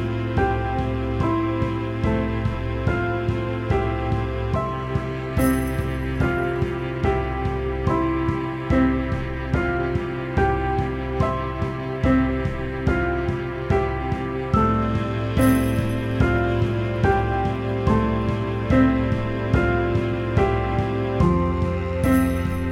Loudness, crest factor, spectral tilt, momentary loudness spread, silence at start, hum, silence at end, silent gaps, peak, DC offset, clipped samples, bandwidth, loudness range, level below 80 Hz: -23 LUFS; 16 dB; -8 dB/octave; 6 LU; 0 s; none; 0 s; none; -6 dBFS; under 0.1%; under 0.1%; 16 kHz; 3 LU; -30 dBFS